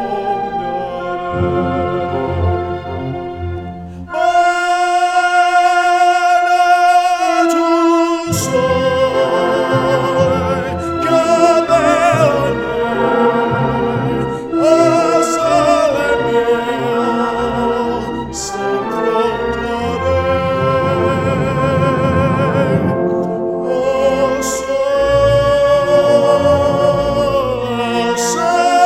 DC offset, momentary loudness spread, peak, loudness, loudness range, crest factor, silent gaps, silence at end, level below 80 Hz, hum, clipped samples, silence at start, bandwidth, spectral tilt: under 0.1%; 8 LU; 0 dBFS; -14 LUFS; 5 LU; 14 dB; none; 0 s; -38 dBFS; none; under 0.1%; 0 s; 16 kHz; -5.5 dB/octave